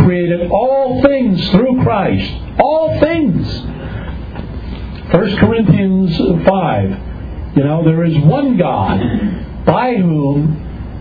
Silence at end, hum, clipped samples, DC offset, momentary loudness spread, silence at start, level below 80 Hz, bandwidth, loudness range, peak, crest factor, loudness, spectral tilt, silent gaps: 0 s; none; under 0.1%; under 0.1%; 14 LU; 0 s; -30 dBFS; 5 kHz; 3 LU; 0 dBFS; 14 dB; -13 LUFS; -10 dB/octave; none